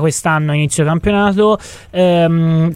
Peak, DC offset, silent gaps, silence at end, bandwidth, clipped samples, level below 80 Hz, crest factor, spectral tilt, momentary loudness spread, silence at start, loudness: 0 dBFS; under 0.1%; none; 0 s; 14.5 kHz; under 0.1%; -38 dBFS; 12 dB; -6 dB/octave; 3 LU; 0 s; -14 LUFS